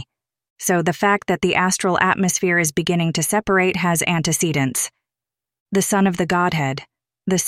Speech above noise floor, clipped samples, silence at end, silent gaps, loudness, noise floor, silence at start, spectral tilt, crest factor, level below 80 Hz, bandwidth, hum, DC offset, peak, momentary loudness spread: 69 dB; under 0.1%; 0 s; 0.50-0.56 s, 5.60-5.66 s; -19 LUFS; -88 dBFS; 0 s; -4 dB/octave; 18 dB; -52 dBFS; 16 kHz; none; under 0.1%; -2 dBFS; 6 LU